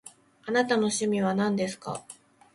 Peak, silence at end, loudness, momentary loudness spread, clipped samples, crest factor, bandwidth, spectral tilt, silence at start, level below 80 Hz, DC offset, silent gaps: -10 dBFS; 0.4 s; -27 LUFS; 13 LU; under 0.1%; 18 dB; 11.5 kHz; -4.5 dB/octave; 0.05 s; -68 dBFS; under 0.1%; none